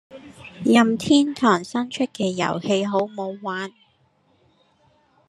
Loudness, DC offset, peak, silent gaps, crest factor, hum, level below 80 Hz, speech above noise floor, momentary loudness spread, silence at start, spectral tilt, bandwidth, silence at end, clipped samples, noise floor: -21 LUFS; under 0.1%; -2 dBFS; none; 20 dB; none; -66 dBFS; 42 dB; 13 LU; 0.1 s; -5 dB/octave; 12 kHz; 1.6 s; under 0.1%; -62 dBFS